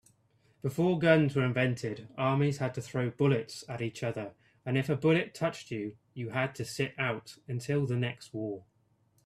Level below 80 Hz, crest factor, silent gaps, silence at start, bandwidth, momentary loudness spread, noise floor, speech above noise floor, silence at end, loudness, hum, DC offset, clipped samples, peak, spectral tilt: -68 dBFS; 22 dB; none; 0.65 s; 13.5 kHz; 13 LU; -70 dBFS; 39 dB; 0.65 s; -31 LUFS; none; under 0.1%; under 0.1%; -10 dBFS; -6.5 dB/octave